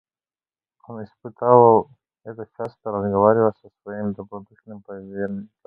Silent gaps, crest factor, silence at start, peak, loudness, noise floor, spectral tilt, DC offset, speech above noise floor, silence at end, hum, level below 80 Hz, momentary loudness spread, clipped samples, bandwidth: none; 22 dB; 0.9 s; 0 dBFS; -19 LUFS; under -90 dBFS; -11.5 dB/octave; under 0.1%; over 69 dB; 0.2 s; none; -58 dBFS; 25 LU; under 0.1%; 4.4 kHz